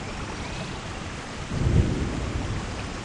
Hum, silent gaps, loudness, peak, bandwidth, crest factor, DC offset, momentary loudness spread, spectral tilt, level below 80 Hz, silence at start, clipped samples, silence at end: none; none; -29 LUFS; -8 dBFS; 10.5 kHz; 20 dB; under 0.1%; 11 LU; -6 dB/octave; -34 dBFS; 0 s; under 0.1%; 0 s